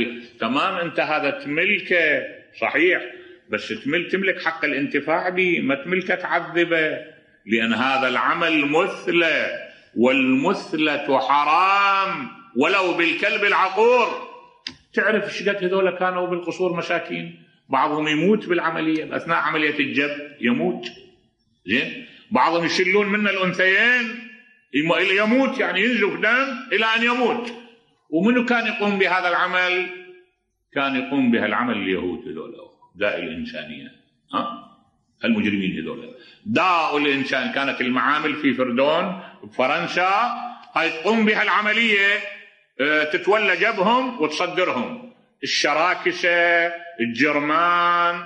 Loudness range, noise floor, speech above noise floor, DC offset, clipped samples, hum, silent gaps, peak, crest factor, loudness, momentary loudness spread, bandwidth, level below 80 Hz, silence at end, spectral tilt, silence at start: 5 LU; -66 dBFS; 45 dB; under 0.1%; under 0.1%; none; none; -4 dBFS; 16 dB; -20 LUFS; 12 LU; 9.8 kHz; -68 dBFS; 0 s; -4.5 dB/octave; 0 s